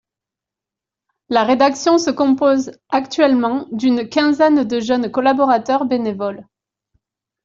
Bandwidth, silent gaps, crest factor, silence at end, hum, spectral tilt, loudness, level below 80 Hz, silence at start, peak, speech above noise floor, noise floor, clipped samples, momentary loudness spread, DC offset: 7.6 kHz; none; 14 dB; 1.05 s; none; -4.5 dB/octave; -16 LUFS; -60 dBFS; 1.3 s; -2 dBFS; 71 dB; -86 dBFS; under 0.1%; 7 LU; under 0.1%